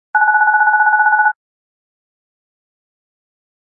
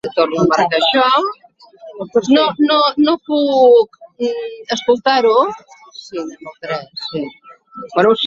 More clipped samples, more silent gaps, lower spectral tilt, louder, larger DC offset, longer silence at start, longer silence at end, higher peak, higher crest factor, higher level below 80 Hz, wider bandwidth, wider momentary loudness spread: neither; neither; about the same, -4 dB/octave vs -4.5 dB/octave; first, -12 LUFS vs -15 LUFS; neither; about the same, 0.15 s vs 0.05 s; first, 2.45 s vs 0 s; about the same, -2 dBFS vs -2 dBFS; about the same, 14 dB vs 14 dB; second, under -90 dBFS vs -60 dBFS; second, 2 kHz vs 7.6 kHz; second, 5 LU vs 17 LU